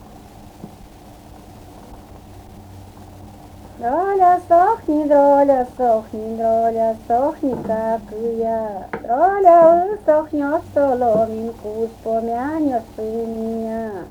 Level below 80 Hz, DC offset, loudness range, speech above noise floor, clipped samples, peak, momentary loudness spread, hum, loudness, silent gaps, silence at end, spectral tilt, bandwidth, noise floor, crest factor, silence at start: -48 dBFS; under 0.1%; 5 LU; 24 dB; under 0.1%; 0 dBFS; 13 LU; none; -18 LUFS; none; 0 s; -7.5 dB/octave; 18.5 kHz; -41 dBFS; 18 dB; 0.05 s